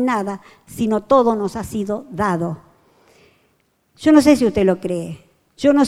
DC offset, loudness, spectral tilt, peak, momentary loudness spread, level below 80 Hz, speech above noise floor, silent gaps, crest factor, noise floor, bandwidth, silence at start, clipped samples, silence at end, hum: under 0.1%; -18 LUFS; -6 dB/octave; -2 dBFS; 19 LU; -48 dBFS; 46 dB; none; 18 dB; -63 dBFS; 14.5 kHz; 0 s; under 0.1%; 0 s; none